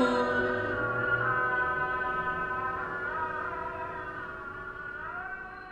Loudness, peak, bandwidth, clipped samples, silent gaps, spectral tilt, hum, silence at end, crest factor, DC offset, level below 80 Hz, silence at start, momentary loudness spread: -31 LUFS; -14 dBFS; 9.2 kHz; under 0.1%; none; -6 dB/octave; none; 0 s; 18 dB; under 0.1%; -54 dBFS; 0 s; 12 LU